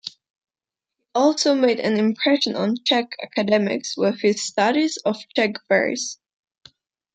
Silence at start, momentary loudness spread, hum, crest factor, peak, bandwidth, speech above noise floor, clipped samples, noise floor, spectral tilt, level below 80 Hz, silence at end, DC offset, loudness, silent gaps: 0.05 s; 8 LU; none; 18 dB; -4 dBFS; 9.4 kHz; 69 dB; under 0.1%; -89 dBFS; -3.5 dB/octave; -72 dBFS; 1 s; under 0.1%; -21 LUFS; 0.30-0.34 s